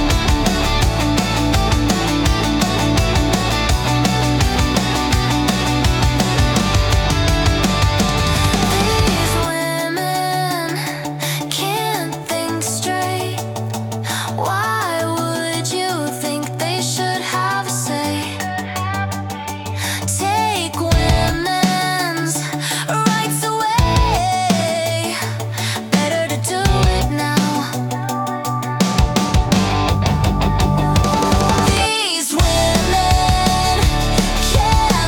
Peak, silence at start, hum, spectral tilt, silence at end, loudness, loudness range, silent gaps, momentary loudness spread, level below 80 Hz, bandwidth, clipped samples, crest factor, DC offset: -2 dBFS; 0 s; none; -4.5 dB/octave; 0 s; -17 LUFS; 5 LU; none; 7 LU; -24 dBFS; 18 kHz; under 0.1%; 14 dB; under 0.1%